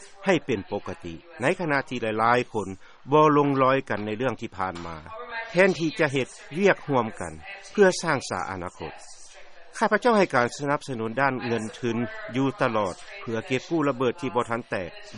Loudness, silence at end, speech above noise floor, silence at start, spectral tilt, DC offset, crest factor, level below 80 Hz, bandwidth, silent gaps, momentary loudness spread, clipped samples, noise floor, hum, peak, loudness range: -25 LUFS; 0 s; 19 dB; 0 s; -5.5 dB/octave; under 0.1%; 22 dB; -58 dBFS; 11 kHz; none; 16 LU; under 0.1%; -44 dBFS; none; -4 dBFS; 4 LU